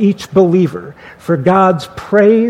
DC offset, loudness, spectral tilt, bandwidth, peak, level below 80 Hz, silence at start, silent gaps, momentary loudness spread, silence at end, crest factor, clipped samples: under 0.1%; -12 LUFS; -7.5 dB/octave; 13 kHz; 0 dBFS; -48 dBFS; 0 s; none; 18 LU; 0 s; 12 dB; under 0.1%